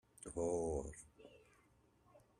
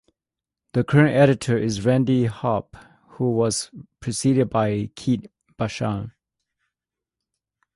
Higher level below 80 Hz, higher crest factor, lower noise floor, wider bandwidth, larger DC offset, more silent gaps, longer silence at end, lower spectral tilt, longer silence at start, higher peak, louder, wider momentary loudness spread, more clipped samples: second, -60 dBFS vs -52 dBFS; about the same, 20 dB vs 20 dB; second, -73 dBFS vs -88 dBFS; first, 13.5 kHz vs 11.5 kHz; neither; neither; second, 0.2 s vs 1.65 s; about the same, -6.5 dB/octave vs -6 dB/octave; second, 0.2 s vs 0.75 s; second, -28 dBFS vs -4 dBFS; second, -43 LUFS vs -22 LUFS; first, 23 LU vs 12 LU; neither